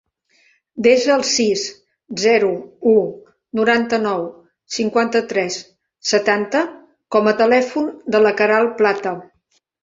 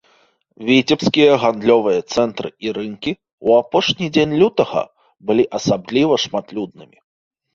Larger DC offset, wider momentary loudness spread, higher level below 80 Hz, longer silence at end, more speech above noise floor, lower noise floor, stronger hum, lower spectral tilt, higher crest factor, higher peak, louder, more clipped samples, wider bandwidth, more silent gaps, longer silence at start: neither; about the same, 12 LU vs 12 LU; second, -64 dBFS vs -54 dBFS; second, 0.6 s vs 0.75 s; first, 48 dB vs 41 dB; first, -65 dBFS vs -58 dBFS; neither; second, -3.5 dB/octave vs -5 dB/octave; about the same, 16 dB vs 16 dB; about the same, -2 dBFS vs 0 dBFS; about the same, -17 LUFS vs -17 LUFS; neither; about the same, 7.8 kHz vs 7.4 kHz; second, none vs 3.33-3.38 s; first, 0.75 s vs 0.6 s